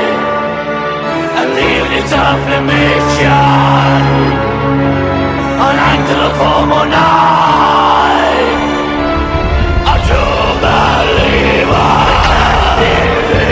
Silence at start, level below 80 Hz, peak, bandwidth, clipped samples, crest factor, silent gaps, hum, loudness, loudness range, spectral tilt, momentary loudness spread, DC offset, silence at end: 0 s; -20 dBFS; 0 dBFS; 8 kHz; 0.2%; 10 dB; none; none; -10 LUFS; 2 LU; -6 dB/octave; 5 LU; under 0.1%; 0 s